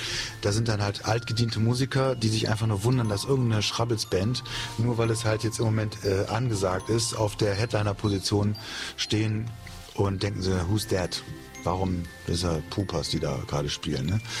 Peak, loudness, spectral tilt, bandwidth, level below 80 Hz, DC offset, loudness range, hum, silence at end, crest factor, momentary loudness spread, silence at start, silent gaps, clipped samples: -10 dBFS; -27 LUFS; -5 dB/octave; 15 kHz; -48 dBFS; under 0.1%; 3 LU; none; 0 s; 16 dB; 5 LU; 0 s; none; under 0.1%